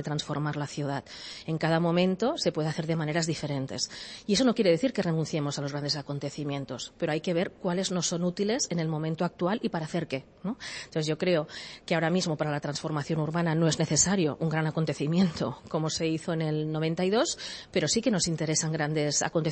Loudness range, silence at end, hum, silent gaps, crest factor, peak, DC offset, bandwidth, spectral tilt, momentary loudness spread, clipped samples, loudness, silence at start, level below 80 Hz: 3 LU; 0 s; none; none; 18 dB; -10 dBFS; under 0.1%; 8.8 kHz; -4.5 dB/octave; 9 LU; under 0.1%; -29 LUFS; 0 s; -60 dBFS